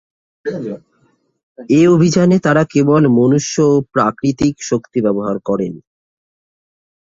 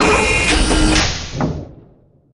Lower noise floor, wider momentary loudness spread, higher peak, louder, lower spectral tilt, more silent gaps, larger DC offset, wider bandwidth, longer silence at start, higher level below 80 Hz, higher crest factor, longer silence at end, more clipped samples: first, -59 dBFS vs -49 dBFS; first, 14 LU vs 10 LU; about the same, 0 dBFS vs -2 dBFS; about the same, -14 LUFS vs -15 LUFS; first, -6.5 dB/octave vs -3.5 dB/octave; first, 1.43-1.55 s vs none; neither; second, 7.8 kHz vs 11 kHz; first, 0.45 s vs 0 s; second, -50 dBFS vs -22 dBFS; about the same, 14 dB vs 14 dB; first, 1.25 s vs 0.6 s; neither